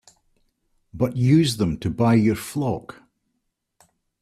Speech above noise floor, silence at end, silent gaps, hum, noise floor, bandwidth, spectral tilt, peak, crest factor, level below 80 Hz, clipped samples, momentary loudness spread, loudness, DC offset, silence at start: 56 dB; 1.4 s; none; none; -76 dBFS; 14.5 kHz; -6.5 dB/octave; -6 dBFS; 18 dB; -50 dBFS; under 0.1%; 9 LU; -21 LUFS; under 0.1%; 0.95 s